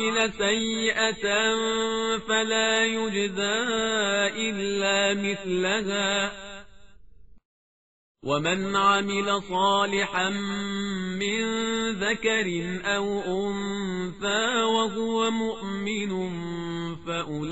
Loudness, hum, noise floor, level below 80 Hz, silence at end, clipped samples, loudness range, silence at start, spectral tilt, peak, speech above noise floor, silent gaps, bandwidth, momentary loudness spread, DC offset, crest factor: -25 LUFS; none; -54 dBFS; -56 dBFS; 0 s; under 0.1%; 4 LU; 0 s; -2 dB/octave; -8 dBFS; 28 dB; 7.45-8.15 s; 8 kHz; 8 LU; 0.4%; 18 dB